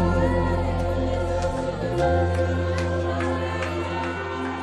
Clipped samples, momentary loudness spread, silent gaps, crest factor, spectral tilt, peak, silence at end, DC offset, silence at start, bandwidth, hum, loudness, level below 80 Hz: under 0.1%; 6 LU; none; 14 dB; -7 dB/octave; -10 dBFS; 0 s; under 0.1%; 0 s; 10.5 kHz; none; -25 LUFS; -34 dBFS